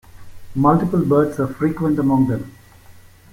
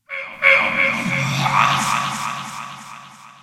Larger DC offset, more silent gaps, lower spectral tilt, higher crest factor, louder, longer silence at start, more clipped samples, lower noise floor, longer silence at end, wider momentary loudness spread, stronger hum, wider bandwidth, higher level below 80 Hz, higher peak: neither; neither; first, -9.5 dB/octave vs -3.5 dB/octave; about the same, 16 dB vs 20 dB; about the same, -18 LUFS vs -17 LUFS; about the same, 0.15 s vs 0.1 s; neither; about the same, -44 dBFS vs -41 dBFS; first, 0.4 s vs 0.1 s; second, 10 LU vs 19 LU; neither; about the same, 16.5 kHz vs 17 kHz; first, -46 dBFS vs -56 dBFS; about the same, -2 dBFS vs 0 dBFS